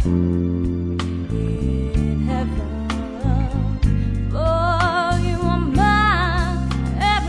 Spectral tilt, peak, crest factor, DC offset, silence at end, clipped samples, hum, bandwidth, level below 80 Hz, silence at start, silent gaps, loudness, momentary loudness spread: -7 dB/octave; -2 dBFS; 16 dB; under 0.1%; 0 s; under 0.1%; none; 10.5 kHz; -24 dBFS; 0 s; none; -20 LUFS; 7 LU